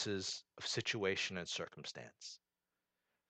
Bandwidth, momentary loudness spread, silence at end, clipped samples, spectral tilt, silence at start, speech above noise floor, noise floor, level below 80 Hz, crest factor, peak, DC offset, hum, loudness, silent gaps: 9.4 kHz; 15 LU; 0.95 s; under 0.1%; -3 dB/octave; 0 s; over 47 dB; under -90 dBFS; -80 dBFS; 22 dB; -22 dBFS; under 0.1%; none; -41 LUFS; none